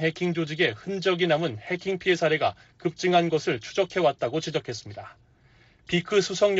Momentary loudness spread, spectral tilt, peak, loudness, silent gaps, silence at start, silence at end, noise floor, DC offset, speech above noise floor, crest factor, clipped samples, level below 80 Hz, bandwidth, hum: 9 LU; -3.5 dB/octave; -8 dBFS; -26 LUFS; none; 0 s; 0 s; -58 dBFS; under 0.1%; 33 dB; 18 dB; under 0.1%; -62 dBFS; 8 kHz; none